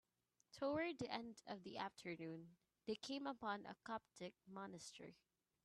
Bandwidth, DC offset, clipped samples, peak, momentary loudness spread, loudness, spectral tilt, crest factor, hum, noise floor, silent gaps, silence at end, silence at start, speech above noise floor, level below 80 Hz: 12.5 kHz; under 0.1%; under 0.1%; -28 dBFS; 12 LU; -50 LUFS; -4.5 dB/octave; 22 dB; none; -85 dBFS; none; 0.5 s; 0.55 s; 35 dB; -84 dBFS